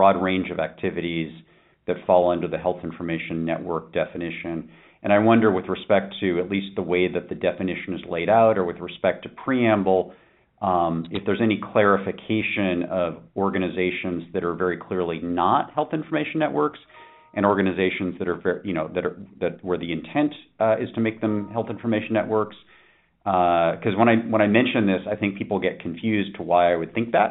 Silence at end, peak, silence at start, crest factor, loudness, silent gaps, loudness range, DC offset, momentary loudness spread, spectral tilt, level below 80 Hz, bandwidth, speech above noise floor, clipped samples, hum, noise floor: 0 s; -2 dBFS; 0 s; 22 dB; -23 LUFS; none; 4 LU; under 0.1%; 10 LU; -5 dB/octave; -58 dBFS; 4.1 kHz; 35 dB; under 0.1%; none; -58 dBFS